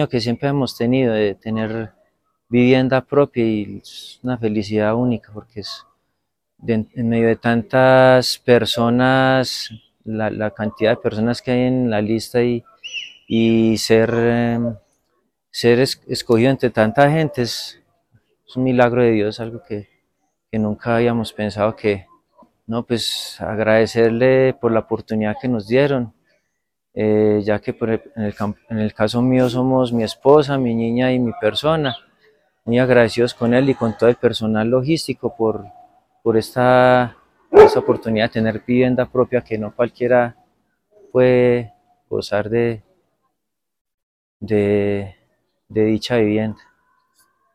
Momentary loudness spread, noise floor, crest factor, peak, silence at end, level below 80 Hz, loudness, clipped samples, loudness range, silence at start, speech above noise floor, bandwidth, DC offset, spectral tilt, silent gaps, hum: 13 LU; -79 dBFS; 18 dB; 0 dBFS; 1 s; -50 dBFS; -18 LUFS; under 0.1%; 6 LU; 0 s; 63 dB; 15.5 kHz; under 0.1%; -6.5 dB/octave; 43.81-43.85 s, 43.94-44.40 s; none